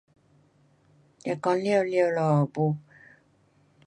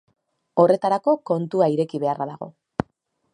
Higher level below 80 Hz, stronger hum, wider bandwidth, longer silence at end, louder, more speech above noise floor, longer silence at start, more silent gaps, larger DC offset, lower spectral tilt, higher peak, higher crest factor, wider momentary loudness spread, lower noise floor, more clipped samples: second, -72 dBFS vs -58 dBFS; neither; about the same, 10 kHz vs 10.5 kHz; first, 1.05 s vs 0.5 s; second, -26 LUFS vs -22 LUFS; second, 39 dB vs 47 dB; first, 1.25 s vs 0.55 s; neither; neither; about the same, -7.5 dB/octave vs -8 dB/octave; second, -10 dBFS vs -2 dBFS; about the same, 18 dB vs 20 dB; about the same, 11 LU vs 13 LU; second, -63 dBFS vs -68 dBFS; neither